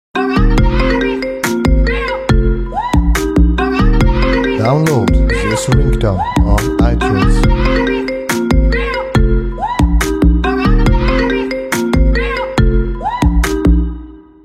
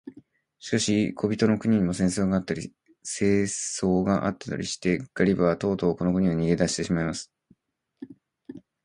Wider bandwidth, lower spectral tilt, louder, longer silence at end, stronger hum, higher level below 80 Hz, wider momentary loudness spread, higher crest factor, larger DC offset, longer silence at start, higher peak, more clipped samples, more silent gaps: first, 15 kHz vs 11.5 kHz; about the same, -6.5 dB/octave vs -5.5 dB/octave; first, -14 LUFS vs -25 LUFS; about the same, 0.25 s vs 0.25 s; neither; first, -14 dBFS vs -50 dBFS; second, 4 LU vs 19 LU; second, 12 dB vs 20 dB; neither; about the same, 0.15 s vs 0.05 s; first, 0 dBFS vs -6 dBFS; neither; neither